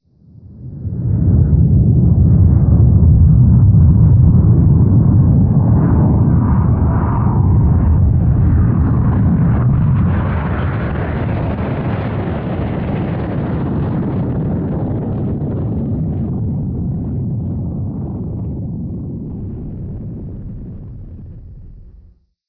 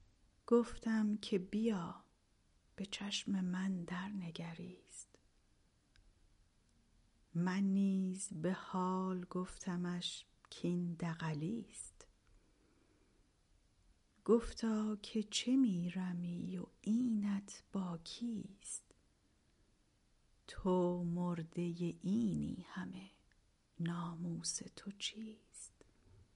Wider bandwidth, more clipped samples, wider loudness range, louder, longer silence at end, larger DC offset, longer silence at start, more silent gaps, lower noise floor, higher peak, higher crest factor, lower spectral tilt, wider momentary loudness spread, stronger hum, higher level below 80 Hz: second, 3.7 kHz vs 11.5 kHz; neither; first, 14 LU vs 8 LU; first, -14 LUFS vs -40 LUFS; first, 0.65 s vs 0.15 s; neither; about the same, 0.45 s vs 0.5 s; neither; second, -46 dBFS vs -74 dBFS; first, -2 dBFS vs -20 dBFS; second, 12 dB vs 20 dB; first, -13.5 dB/octave vs -5.5 dB/octave; about the same, 17 LU vs 16 LU; neither; first, -22 dBFS vs -66 dBFS